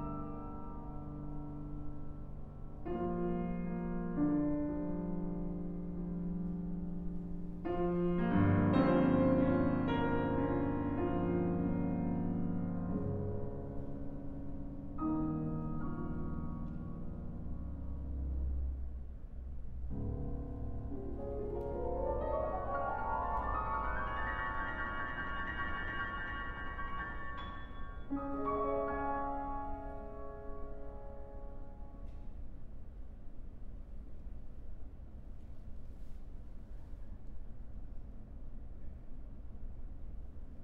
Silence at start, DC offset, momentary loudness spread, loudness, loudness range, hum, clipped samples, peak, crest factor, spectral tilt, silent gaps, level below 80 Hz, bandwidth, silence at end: 0 s; under 0.1%; 19 LU; -38 LUFS; 21 LU; none; under 0.1%; -18 dBFS; 20 dB; -10 dB/octave; none; -44 dBFS; 4.6 kHz; 0 s